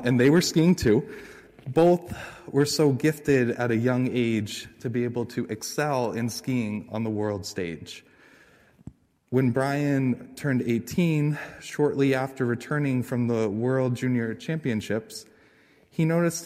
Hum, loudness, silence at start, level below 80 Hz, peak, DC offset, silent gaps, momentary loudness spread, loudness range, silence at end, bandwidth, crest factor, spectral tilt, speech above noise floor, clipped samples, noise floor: none; -25 LUFS; 0 s; -54 dBFS; -10 dBFS; under 0.1%; none; 13 LU; 6 LU; 0 s; 16 kHz; 16 dB; -6 dB/octave; 34 dB; under 0.1%; -58 dBFS